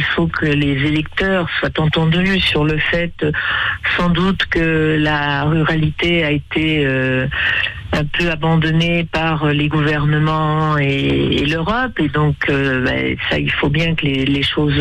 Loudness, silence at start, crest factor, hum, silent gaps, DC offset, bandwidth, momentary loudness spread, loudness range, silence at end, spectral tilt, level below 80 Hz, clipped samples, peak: -16 LUFS; 0 s; 10 dB; none; none; under 0.1%; 9 kHz; 3 LU; 1 LU; 0 s; -7 dB/octave; -34 dBFS; under 0.1%; -6 dBFS